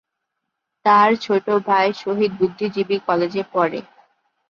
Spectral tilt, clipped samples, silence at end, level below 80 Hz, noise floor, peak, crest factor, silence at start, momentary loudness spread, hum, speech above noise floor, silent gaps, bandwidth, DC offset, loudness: -6.5 dB/octave; under 0.1%; 0.7 s; -66 dBFS; -78 dBFS; -4 dBFS; 16 dB; 0.85 s; 8 LU; none; 60 dB; none; 7 kHz; under 0.1%; -19 LUFS